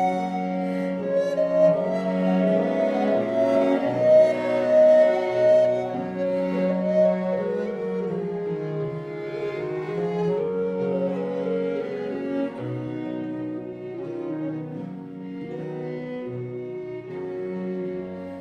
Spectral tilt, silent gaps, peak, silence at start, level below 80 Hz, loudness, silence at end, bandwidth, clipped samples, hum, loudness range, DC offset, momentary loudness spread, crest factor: -8 dB/octave; none; -8 dBFS; 0 s; -66 dBFS; -24 LUFS; 0 s; 8.4 kHz; under 0.1%; none; 13 LU; under 0.1%; 15 LU; 16 dB